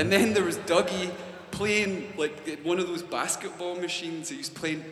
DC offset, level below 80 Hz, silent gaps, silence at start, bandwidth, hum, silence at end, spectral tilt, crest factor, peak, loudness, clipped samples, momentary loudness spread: under 0.1%; -62 dBFS; none; 0 s; 15 kHz; none; 0 s; -3.5 dB/octave; 22 dB; -6 dBFS; -28 LUFS; under 0.1%; 10 LU